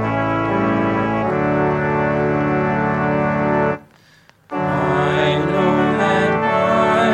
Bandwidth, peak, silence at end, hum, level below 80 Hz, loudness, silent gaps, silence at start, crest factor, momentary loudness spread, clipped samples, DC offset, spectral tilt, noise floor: 11.5 kHz; -4 dBFS; 0 s; none; -44 dBFS; -17 LUFS; none; 0 s; 14 dB; 3 LU; under 0.1%; under 0.1%; -7.5 dB/octave; -51 dBFS